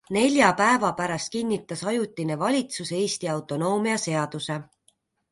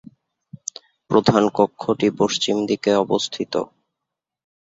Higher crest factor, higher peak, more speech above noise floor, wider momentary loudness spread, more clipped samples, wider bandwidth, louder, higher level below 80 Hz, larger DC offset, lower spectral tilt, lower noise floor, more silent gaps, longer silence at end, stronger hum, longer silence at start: about the same, 20 dB vs 20 dB; about the same, -4 dBFS vs -2 dBFS; second, 42 dB vs 65 dB; second, 10 LU vs 16 LU; neither; first, 11.5 kHz vs 7.8 kHz; second, -25 LUFS vs -20 LUFS; second, -64 dBFS vs -58 dBFS; neither; about the same, -4.5 dB/octave vs -5 dB/octave; second, -67 dBFS vs -84 dBFS; neither; second, 0.7 s vs 1 s; neither; second, 0.1 s vs 0.55 s